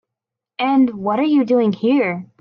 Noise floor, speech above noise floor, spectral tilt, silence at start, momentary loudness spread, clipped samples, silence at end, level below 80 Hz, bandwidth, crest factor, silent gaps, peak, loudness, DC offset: -84 dBFS; 68 dB; -8.5 dB/octave; 0.6 s; 7 LU; under 0.1%; 0.15 s; -68 dBFS; 5.6 kHz; 12 dB; none; -6 dBFS; -17 LUFS; under 0.1%